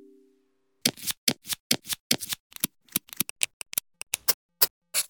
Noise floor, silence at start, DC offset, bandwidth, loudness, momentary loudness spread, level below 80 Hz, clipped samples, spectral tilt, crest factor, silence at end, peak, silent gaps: -71 dBFS; 0.85 s; under 0.1%; 19 kHz; -27 LUFS; 7 LU; -66 dBFS; under 0.1%; -0.5 dB/octave; 30 dB; 0.05 s; 0 dBFS; 1.17-1.27 s, 1.60-1.70 s, 2.00-2.10 s, 2.40-2.50 s, 3.30-3.36 s, 3.53-3.60 s, 4.34-4.49 s, 4.70-4.82 s